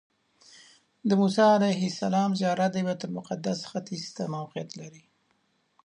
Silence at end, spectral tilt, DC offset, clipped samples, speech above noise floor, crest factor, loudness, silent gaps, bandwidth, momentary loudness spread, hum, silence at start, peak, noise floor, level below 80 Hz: 0.9 s; -6 dB/octave; under 0.1%; under 0.1%; 45 dB; 20 dB; -27 LUFS; none; 10.5 kHz; 16 LU; none; 1.05 s; -8 dBFS; -71 dBFS; -76 dBFS